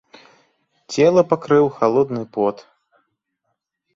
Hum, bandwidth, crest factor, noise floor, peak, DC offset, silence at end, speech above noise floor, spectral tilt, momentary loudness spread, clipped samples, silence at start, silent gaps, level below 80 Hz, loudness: none; 7.8 kHz; 18 dB; -75 dBFS; -2 dBFS; under 0.1%; 1.4 s; 58 dB; -6.5 dB/octave; 8 LU; under 0.1%; 0.9 s; none; -62 dBFS; -18 LUFS